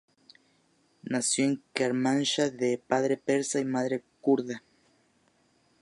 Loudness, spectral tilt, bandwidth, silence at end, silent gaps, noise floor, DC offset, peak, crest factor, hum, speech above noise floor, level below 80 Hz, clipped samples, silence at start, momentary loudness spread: -28 LUFS; -4 dB/octave; 11.5 kHz; 1.25 s; none; -68 dBFS; under 0.1%; -8 dBFS; 22 dB; none; 40 dB; -78 dBFS; under 0.1%; 1.05 s; 7 LU